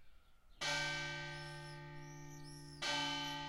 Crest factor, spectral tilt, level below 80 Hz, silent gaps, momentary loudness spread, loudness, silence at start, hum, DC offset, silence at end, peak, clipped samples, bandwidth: 18 dB; -2.5 dB/octave; -64 dBFS; none; 15 LU; -41 LUFS; 0 s; none; under 0.1%; 0 s; -28 dBFS; under 0.1%; 16.5 kHz